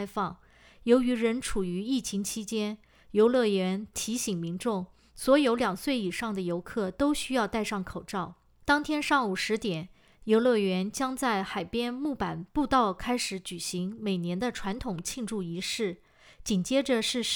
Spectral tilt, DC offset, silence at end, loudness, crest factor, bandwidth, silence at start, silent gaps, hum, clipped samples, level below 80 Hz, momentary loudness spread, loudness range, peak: -4.5 dB/octave; under 0.1%; 0 s; -29 LUFS; 20 dB; over 20 kHz; 0 s; none; none; under 0.1%; -54 dBFS; 11 LU; 3 LU; -8 dBFS